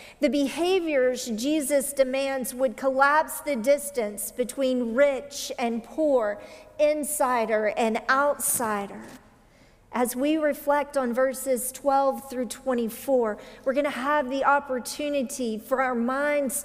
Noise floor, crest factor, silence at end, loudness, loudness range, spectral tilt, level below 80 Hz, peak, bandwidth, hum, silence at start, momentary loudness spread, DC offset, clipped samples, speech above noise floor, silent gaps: -56 dBFS; 18 dB; 0 s; -25 LUFS; 2 LU; -3 dB/octave; -60 dBFS; -8 dBFS; 16 kHz; none; 0 s; 8 LU; under 0.1%; under 0.1%; 31 dB; none